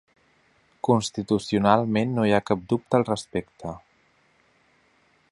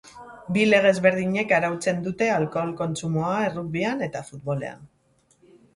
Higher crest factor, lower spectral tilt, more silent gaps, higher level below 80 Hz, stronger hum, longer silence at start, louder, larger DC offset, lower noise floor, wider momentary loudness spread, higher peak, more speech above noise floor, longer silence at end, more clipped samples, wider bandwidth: about the same, 24 dB vs 20 dB; about the same, -6 dB/octave vs -5.5 dB/octave; neither; about the same, -56 dBFS vs -60 dBFS; neither; first, 0.85 s vs 0.05 s; about the same, -24 LUFS vs -23 LUFS; neither; about the same, -63 dBFS vs -64 dBFS; first, 16 LU vs 13 LU; about the same, -2 dBFS vs -4 dBFS; about the same, 40 dB vs 40 dB; first, 1.55 s vs 0.9 s; neither; about the same, 11.5 kHz vs 11.5 kHz